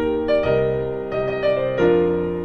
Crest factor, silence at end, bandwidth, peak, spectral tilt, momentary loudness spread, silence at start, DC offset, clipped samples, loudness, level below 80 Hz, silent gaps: 14 dB; 0 s; 6.6 kHz; -6 dBFS; -8.5 dB/octave; 7 LU; 0 s; under 0.1%; under 0.1%; -20 LUFS; -42 dBFS; none